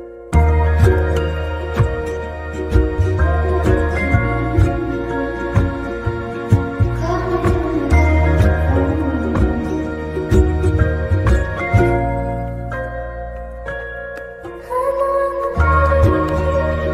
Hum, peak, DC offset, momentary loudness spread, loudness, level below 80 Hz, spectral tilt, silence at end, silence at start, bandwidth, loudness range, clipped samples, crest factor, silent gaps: none; -2 dBFS; under 0.1%; 11 LU; -18 LUFS; -22 dBFS; -8 dB/octave; 0 s; 0 s; 11 kHz; 4 LU; under 0.1%; 16 dB; none